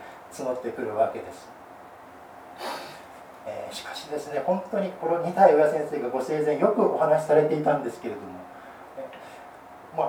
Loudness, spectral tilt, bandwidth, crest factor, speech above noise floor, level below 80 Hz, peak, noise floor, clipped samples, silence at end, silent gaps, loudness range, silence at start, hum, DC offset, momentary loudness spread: -25 LUFS; -6 dB/octave; 18.5 kHz; 22 dB; 22 dB; -70 dBFS; -6 dBFS; -46 dBFS; under 0.1%; 0 s; none; 11 LU; 0 s; none; under 0.1%; 25 LU